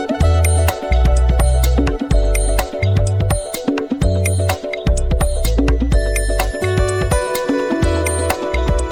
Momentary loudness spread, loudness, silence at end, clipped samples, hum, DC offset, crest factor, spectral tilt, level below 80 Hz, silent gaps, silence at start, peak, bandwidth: 4 LU; -17 LUFS; 0 s; under 0.1%; none; under 0.1%; 14 dB; -5.5 dB/octave; -18 dBFS; none; 0 s; -2 dBFS; 19 kHz